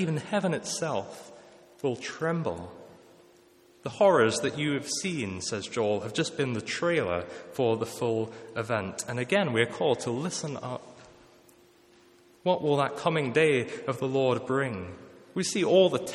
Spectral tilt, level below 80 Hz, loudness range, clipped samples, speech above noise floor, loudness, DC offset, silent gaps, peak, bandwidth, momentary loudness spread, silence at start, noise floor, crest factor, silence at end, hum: -4.5 dB/octave; -68 dBFS; 5 LU; under 0.1%; 31 dB; -28 LUFS; under 0.1%; none; -8 dBFS; 14 kHz; 13 LU; 0 s; -59 dBFS; 20 dB; 0 s; none